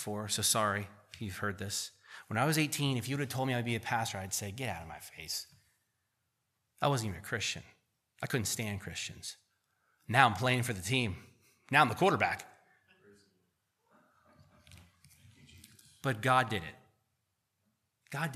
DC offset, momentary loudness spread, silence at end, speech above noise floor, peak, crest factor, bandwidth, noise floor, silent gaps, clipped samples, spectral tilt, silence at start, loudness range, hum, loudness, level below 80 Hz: under 0.1%; 17 LU; 0 s; 49 dB; -8 dBFS; 28 dB; 15 kHz; -82 dBFS; none; under 0.1%; -3.5 dB/octave; 0 s; 8 LU; none; -33 LUFS; -68 dBFS